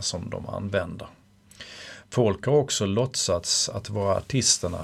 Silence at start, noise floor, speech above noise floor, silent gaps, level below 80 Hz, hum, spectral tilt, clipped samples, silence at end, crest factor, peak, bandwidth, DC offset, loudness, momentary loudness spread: 0 s; -48 dBFS; 22 dB; none; -52 dBFS; none; -3.5 dB/octave; under 0.1%; 0 s; 20 dB; -6 dBFS; 15 kHz; under 0.1%; -25 LUFS; 20 LU